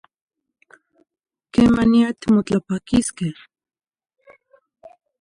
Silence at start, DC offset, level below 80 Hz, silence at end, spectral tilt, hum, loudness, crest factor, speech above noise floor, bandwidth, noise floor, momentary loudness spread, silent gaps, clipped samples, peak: 1.55 s; under 0.1%; -46 dBFS; 1.9 s; -6 dB/octave; none; -19 LUFS; 18 dB; 40 dB; 11.5 kHz; -58 dBFS; 11 LU; none; under 0.1%; -4 dBFS